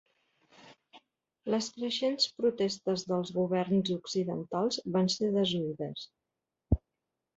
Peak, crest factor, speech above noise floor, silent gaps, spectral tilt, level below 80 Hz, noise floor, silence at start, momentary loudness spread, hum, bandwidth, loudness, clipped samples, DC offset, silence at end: -12 dBFS; 20 dB; 57 dB; none; -5.5 dB/octave; -50 dBFS; -88 dBFS; 0.65 s; 7 LU; none; 8 kHz; -31 LUFS; under 0.1%; under 0.1%; 0.6 s